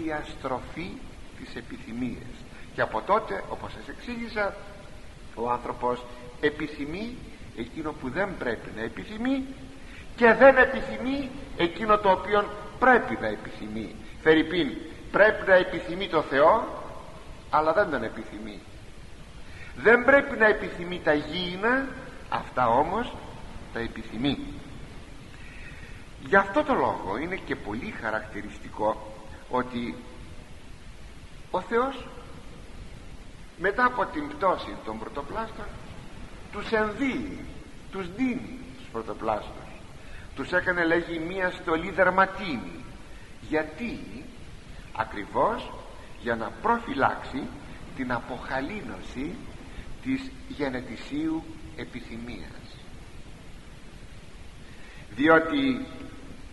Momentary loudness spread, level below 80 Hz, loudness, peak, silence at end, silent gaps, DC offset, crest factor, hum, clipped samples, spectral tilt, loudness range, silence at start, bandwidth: 25 LU; -46 dBFS; -26 LUFS; -4 dBFS; 0 s; none; 0.4%; 24 dB; none; under 0.1%; -6 dB/octave; 11 LU; 0 s; 11.5 kHz